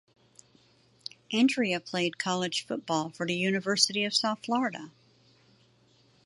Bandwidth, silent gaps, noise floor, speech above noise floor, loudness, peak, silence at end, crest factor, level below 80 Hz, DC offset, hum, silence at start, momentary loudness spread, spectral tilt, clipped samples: 11.5 kHz; none; -64 dBFS; 35 dB; -28 LUFS; -6 dBFS; 1.35 s; 24 dB; -78 dBFS; under 0.1%; none; 1.3 s; 18 LU; -3.5 dB/octave; under 0.1%